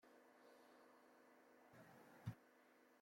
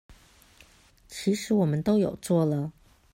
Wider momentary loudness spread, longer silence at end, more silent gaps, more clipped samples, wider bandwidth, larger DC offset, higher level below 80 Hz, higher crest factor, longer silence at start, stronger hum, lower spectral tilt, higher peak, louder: first, 12 LU vs 9 LU; second, 0 s vs 0.45 s; neither; neither; about the same, 16.5 kHz vs 16 kHz; neither; second, -86 dBFS vs -58 dBFS; first, 26 dB vs 16 dB; about the same, 0 s vs 0.1 s; neither; about the same, -6.5 dB/octave vs -7 dB/octave; second, -38 dBFS vs -12 dBFS; second, -62 LUFS vs -26 LUFS